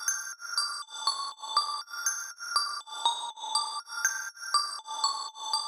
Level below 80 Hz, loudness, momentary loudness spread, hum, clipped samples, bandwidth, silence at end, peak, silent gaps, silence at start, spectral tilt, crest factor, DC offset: under -90 dBFS; -30 LUFS; 5 LU; none; under 0.1%; over 20 kHz; 0 s; -12 dBFS; none; 0 s; 5.5 dB/octave; 22 dB; under 0.1%